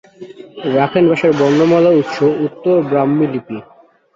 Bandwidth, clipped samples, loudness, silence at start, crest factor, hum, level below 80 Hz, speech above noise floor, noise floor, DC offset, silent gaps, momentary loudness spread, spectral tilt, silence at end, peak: 7.6 kHz; under 0.1%; -14 LUFS; 0.2 s; 14 dB; none; -56 dBFS; 22 dB; -35 dBFS; under 0.1%; none; 14 LU; -7.5 dB/octave; 0.55 s; -2 dBFS